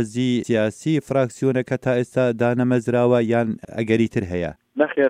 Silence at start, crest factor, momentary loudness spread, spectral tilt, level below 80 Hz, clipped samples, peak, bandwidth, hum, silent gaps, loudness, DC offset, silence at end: 0 s; 16 dB; 7 LU; -7 dB/octave; -54 dBFS; under 0.1%; -4 dBFS; 11 kHz; none; none; -21 LUFS; under 0.1%; 0 s